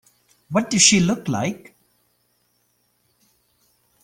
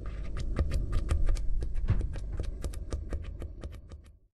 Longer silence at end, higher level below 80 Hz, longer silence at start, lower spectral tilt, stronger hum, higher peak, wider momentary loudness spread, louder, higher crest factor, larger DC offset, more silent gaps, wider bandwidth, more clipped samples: first, 2.45 s vs 0.25 s; second, -56 dBFS vs -32 dBFS; first, 0.5 s vs 0 s; second, -3 dB/octave vs -7 dB/octave; first, 60 Hz at -55 dBFS vs none; first, 0 dBFS vs -14 dBFS; about the same, 14 LU vs 13 LU; first, -18 LUFS vs -36 LUFS; first, 24 dB vs 18 dB; neither; neither; first, 16 kHz vs 11.5 kHz; neither